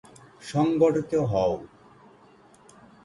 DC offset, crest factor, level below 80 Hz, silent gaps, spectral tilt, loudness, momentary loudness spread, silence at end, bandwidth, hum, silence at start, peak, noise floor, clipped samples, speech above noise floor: under 0.1%; 18 dB; -56 dBFS; none; -7.5 dB/octave; -25 LUFS; 12 LU; 1.4 s; 11.5 kHz; none; 0.4 s; -8 dBFS; -55 dBFS; under 0.1%; 31 dB